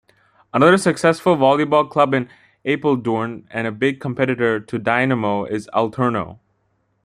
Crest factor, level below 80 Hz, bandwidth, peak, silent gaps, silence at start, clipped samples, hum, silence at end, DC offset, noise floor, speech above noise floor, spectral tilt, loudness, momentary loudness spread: 18 dB; -60 dBFS; 14 kHz; -2 dBFS; none; 0.55 s; under 0.1%; none; 0.7 s; under 0.1%; -66 dBFS; 48 dB; -6 dB/octave; -18 LUFS; 11 LU